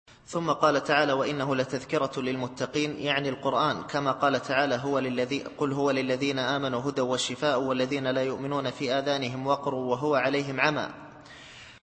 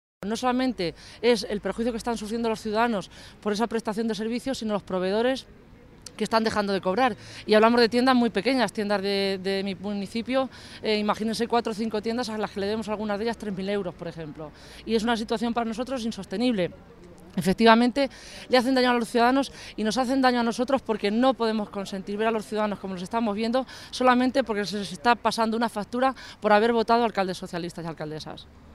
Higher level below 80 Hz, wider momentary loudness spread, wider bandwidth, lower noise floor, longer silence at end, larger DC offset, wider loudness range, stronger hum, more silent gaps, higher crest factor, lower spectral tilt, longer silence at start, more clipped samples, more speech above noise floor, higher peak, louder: second, -64 dBFS vs -54 dBFS; second, 7 LU vs 13 LU; second, 8.8 kHz vs 14 kHz; about the same, -48 dBFS vs -47 dBFS; about the same, 0.05 s vs 0 s; neither; second, 1 LU vs 6 LU; neither; neither; about the same, 20 dB vs 22 dB; about the same, -5 dB/octave vs -5 dB/octave; about the same, 0.1 s vs 0.2 s; neither; about the same, 20 dB vs 22 dB; about the same, -6 dBFS vs -4 dBFS; about the same, -27 LUFS vs -25 LUFS